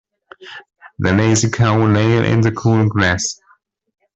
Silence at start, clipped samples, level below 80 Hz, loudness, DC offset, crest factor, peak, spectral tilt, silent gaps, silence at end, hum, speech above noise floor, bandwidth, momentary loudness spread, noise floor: 0.4 s; under 0.1%; -46 dBFS; -15 LUFS; under 0.1%; 14 dB; -2 dBFS; -5.5 dB/octave; none; 0.8 s; none; 41 dB; 8.2 kHz; 21 LU; -56 dBFS